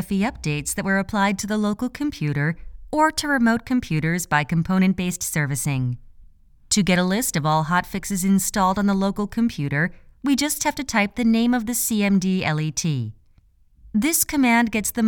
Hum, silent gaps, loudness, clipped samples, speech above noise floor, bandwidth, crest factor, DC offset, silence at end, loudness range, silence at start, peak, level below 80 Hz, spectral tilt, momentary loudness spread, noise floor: none; none; -21 LUFS; under 0.1%; 34 dB; 19 kHz; 16 dB; under 0.1%; 0 s; 1 LU; 0 s; -6 dBFS; -44 dBFS; -4.5 dB/octave; 7 LU; -56 dBFS